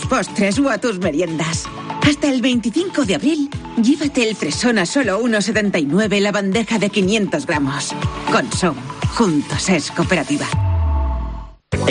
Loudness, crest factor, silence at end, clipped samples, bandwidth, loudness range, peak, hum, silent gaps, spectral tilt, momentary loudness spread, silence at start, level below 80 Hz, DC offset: -18 LUFS; 14 dB; 0 s; under 0.1%; 10 kHz; 2 LU; -4 dBFS; none; none; -5 dB/octave; 6 LU; 0 s; -32 dBFS; under 0.1%